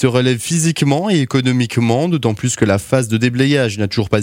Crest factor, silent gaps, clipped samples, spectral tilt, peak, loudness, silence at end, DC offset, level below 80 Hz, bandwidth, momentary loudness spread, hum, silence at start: 14 dB; none; under 0.1%; -5.5 dB/octave; 0 dBFS; -15 LUFS; 0 s; under 0.1%; -48 dBFS; 16.5 kHz; 3 LU; none; 0 s